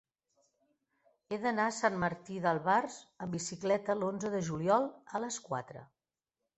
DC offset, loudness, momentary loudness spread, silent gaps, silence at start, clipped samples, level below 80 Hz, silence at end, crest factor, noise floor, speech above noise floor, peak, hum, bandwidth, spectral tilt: under 0.1%; -34 LUFS; 11 LU; none; 1.3 s; under 0.1%; -70 dBFS; 0.7 s; 22 dB; under -90 dBFS; over 56 dB; -14 dBFS; none; 8.2 kHz; -5 dB/octave